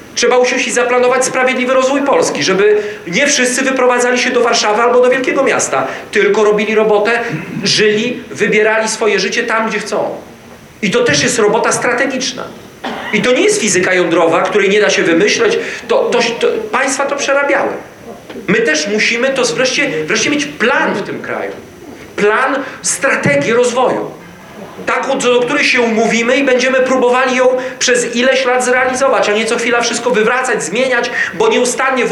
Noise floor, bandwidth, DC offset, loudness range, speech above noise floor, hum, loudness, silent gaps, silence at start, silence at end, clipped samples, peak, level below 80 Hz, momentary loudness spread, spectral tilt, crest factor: -36 dBFS; 13.5 kHz; under 0.1%; 3 LU; 24 dB; none; -12 LUFS; none; 0 s; 0 s; under 0.1%; -2 dBFS; -54 dBFS; 8 LU; -3 dB/octave; 10 dB